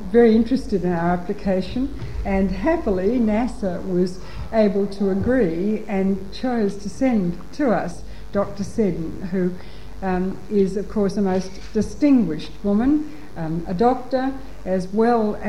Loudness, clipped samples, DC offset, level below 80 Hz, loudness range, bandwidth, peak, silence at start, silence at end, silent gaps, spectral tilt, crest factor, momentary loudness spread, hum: -22 LUFS; under 0.1%; 3%; -38 dBFS; 3 LU; 11.5 kHz; -4 dBFS; 0 s; 0 s; none; -7.5 dB/octave; 16 dB; 9 LU; none